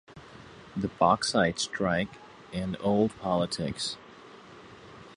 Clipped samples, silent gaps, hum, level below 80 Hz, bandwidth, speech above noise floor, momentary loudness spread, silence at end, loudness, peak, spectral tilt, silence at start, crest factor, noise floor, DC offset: under 0.1%; none; none; -56 dBFS; 11.5 kHz; 22 dB; 24 LU; 0 s; -28 LUFS; -8 dBFS; -4.5 dB/octave; 0.1 s; 22 dB; -50 dBFS; under 0.1%